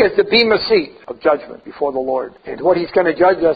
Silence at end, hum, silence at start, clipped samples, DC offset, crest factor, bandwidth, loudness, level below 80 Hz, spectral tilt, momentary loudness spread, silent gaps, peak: 0 s; none; 0 s; under 0.1%; under 0.1%; 16 dB; 5 kHz; -16 LUFS; -50 dBFS; -7 dB/octave; 10 LU; none; 0 dBFS